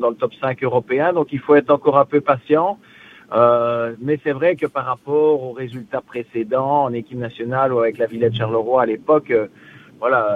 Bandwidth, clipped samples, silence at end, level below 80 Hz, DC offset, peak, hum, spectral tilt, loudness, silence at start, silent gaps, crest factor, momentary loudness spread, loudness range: 4.5 kHz; under 0.1%; 0 s; -62 dBFS; under 0.1%; 0 dBFS; none; -8.5 dB/octave; -18 LUFS; 0 s; none; 18 dB; 12 LU; 4 LU